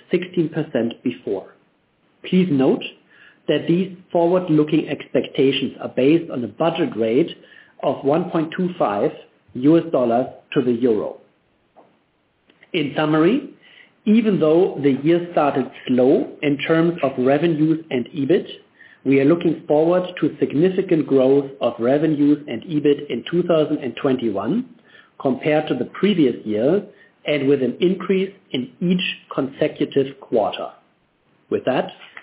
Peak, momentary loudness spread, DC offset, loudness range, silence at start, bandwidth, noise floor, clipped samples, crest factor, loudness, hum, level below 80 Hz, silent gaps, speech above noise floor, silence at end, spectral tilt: -4 dBFS; 9 LU; under 0.1%; 4 LU; 0.1 s; 4 kHz; -64 dBFS; under 0.1%; 16 dB; -20 LUFS; none; -66 dBFS; none; 45 dB; 0.15 s; -11 dB/octave